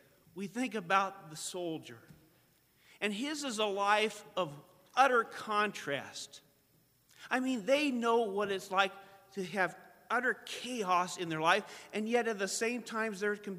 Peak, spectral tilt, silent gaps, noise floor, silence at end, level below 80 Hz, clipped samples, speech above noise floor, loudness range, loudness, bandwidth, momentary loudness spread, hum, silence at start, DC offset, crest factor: -12 dBFS; -3.5 dB/octave; none; -70 dBFS; 0 s; -82 dBFS; under 0.1%; 36 dB; 3 LU; -33 LUFS; 15.5 kHz; 12 LU; none; 0.35 s; under 0.1%; 22 dB